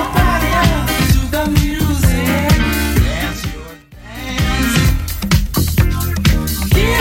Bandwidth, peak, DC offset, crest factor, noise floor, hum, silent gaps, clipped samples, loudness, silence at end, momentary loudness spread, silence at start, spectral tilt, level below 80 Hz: 17 kHz; 0 dBFS; under 0.1%; 14 dB; -34 dBFS; none; none; under 0.1%; -15 LUFS; 0 s; 8 LU; 0 s; -5 dB/octave; -20 dBFS